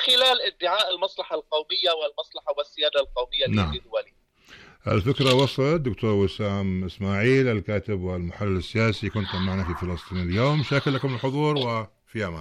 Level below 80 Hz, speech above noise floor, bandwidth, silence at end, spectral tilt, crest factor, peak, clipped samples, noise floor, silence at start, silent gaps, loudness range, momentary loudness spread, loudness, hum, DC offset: -46 dBFS; 28 dB; 15.5 kHz; 0 s; -6 dB/octave; 14 dB; -10 dBFS; under 0.1%; -52 dBFS; 0 s; none; 3 LU; 10 LU; -24 LUFS; none; under 0.1%